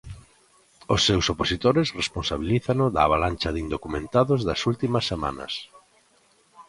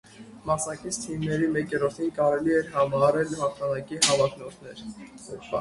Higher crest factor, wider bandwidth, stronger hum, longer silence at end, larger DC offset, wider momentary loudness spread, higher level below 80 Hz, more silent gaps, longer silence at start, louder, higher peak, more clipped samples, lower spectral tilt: about the same, 20 dB vs 20 dB; about the same, 11.5 kHz vs 11.5 kHz; neither; about the same, 0.05 s vs 0 s; neither; second, 9 LU vs 19 LU; first, -42 dBFS vs -56 dBFS; neither; about the same, 0.05 s vs 0.15 s; about the same, -24 LUFS vs -25 LUFS; about the same, -4 dBFS vs -6 dBFS; neither; about the same, -5 dB/octave vs -4 dB/octave